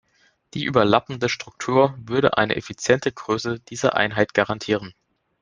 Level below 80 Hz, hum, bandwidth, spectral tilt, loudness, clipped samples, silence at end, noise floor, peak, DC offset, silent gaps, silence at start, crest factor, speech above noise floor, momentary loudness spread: -56 dBFS; none; 10 kHz; -5 dB/octave; -22 LUFS; under 0.1%; 0.5 s; -62 dBFS; -2 dBFS; under 0.1%; none; 0.55 s; 20 dB; 41 dB; 7 LU